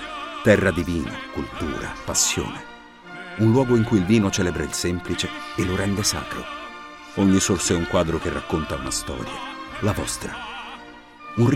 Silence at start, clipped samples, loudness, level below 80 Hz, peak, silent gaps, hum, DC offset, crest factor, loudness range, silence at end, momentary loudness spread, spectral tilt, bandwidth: 0 s; under 0.1%; -23 LUFS; -42 dBFS; -2 dBFS; none; none; under 0.1%; 20 dB; 4 LU; 0 s; 17 LU; -4.5 dB/octave; 16.5 kHz